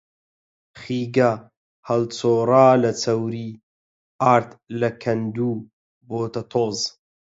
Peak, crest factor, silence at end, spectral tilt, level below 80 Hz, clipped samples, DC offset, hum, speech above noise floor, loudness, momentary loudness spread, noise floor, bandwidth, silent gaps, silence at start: -2 dBFS; 20 dB; 0.45 s; -6 dB/octave; -64 dBFS; under 0.1%; under 0.1%; none; over 70 dB; -21 LUFS; 17 LU; under -90 dBFS; 8 kHz; 1.57-1.83 s, 3.63-4.19 s, 5.73-6.01 s; 0.75 s